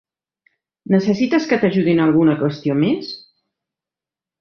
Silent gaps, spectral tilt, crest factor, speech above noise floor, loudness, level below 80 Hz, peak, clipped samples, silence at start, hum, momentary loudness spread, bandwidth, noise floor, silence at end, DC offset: none; -7.5 dB/octave; 16 dB; 73 dB; -17 LUFS; -58 dBFS; -2 dBFS; under 0.1%; 0.9 s; none; 8 LU; 6.8 kHz; -89 dBFS; 1.2 s; under 0.1%